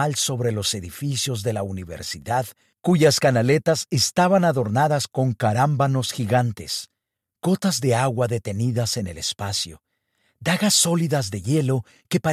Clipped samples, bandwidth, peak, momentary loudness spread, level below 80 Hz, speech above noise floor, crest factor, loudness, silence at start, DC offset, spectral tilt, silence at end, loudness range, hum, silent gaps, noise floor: under 0.1%; 15.5 kHz; -6 dBFS; 11 LU; -56 dBFS; 48 dB; 16 dB; -22 LUFS; 0 s; under 0.1%; -4.5 dB/octave; 0 s; 4 LU; none; none; -69 dBFS